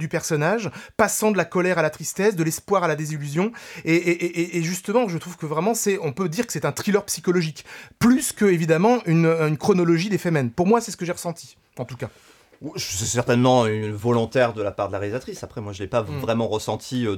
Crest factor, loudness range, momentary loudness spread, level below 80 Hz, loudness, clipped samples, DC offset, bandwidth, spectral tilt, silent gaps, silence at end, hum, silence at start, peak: 18 dB; 4 LU; 13 LU; -56 dBFS; -22 LUFS; under 0.1%; under 0.1%; 18 kHz; -5 dB/octave; none; 0 s; none; 0 s; -4 dBFS